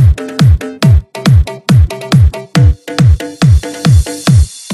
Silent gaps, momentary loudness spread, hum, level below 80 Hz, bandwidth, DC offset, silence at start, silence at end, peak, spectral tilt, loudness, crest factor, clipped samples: none; 1 LU; none; -16 dBFS; 13 kHz; under 0.1%; 0 s; 0 s; 0 dBFS; -6.5 dB/octave; -10 LUFS; 8 dB; under 0.1%